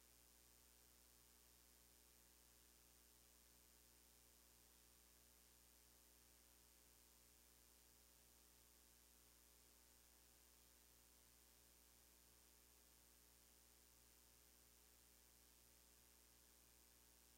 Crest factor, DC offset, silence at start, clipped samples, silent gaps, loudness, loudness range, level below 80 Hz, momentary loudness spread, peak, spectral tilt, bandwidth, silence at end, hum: 18 dB; under 0.1%; 0 s; under 0.1%; none; -70 LUFS; 0 LU; -80 dBFS; 0 LU; -54 dBFS; -1.5 dB/octave; 16 kHz; 0 s; 60 Hz at -80 dBFS